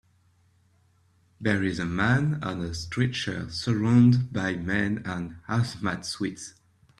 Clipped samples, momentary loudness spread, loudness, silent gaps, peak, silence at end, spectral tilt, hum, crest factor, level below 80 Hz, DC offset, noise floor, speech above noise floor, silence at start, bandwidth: under 0.1%; 12 LU; -26 LUFS; none; -8 dBFS; 0.5 s; -6 dB/octave; none; 20 dB; -54 dBFS; under 0.1%; -64 dBFS; 38 dB; 1.4 s; 11.5 kHz